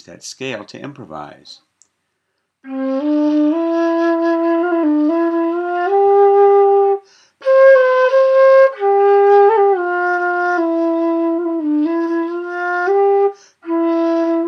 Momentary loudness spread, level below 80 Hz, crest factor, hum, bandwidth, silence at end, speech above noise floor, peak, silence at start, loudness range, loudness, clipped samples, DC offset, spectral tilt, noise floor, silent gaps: 16 LU; -74 dBFS; 14 dB; none; 8 kHz; 0 s; 51 dB; 0 dBFS; 0.1 s; 8 LU; -14 LUFS; under 0.1%; under 0.1%; -5.5 dB/octave; -71 dBFS; none